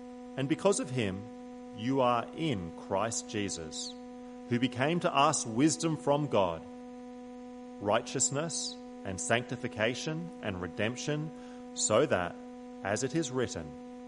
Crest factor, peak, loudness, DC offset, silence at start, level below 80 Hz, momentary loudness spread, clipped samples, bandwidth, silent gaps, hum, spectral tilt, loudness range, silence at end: 22 dB; -10 dBFS; -32 LUFS; under 0.1%; 0 s; -64 dBFS; 18 LU; under 0.1%; 11.5 kHz; none; none; -4 dB/octave; 4 LU; 0 s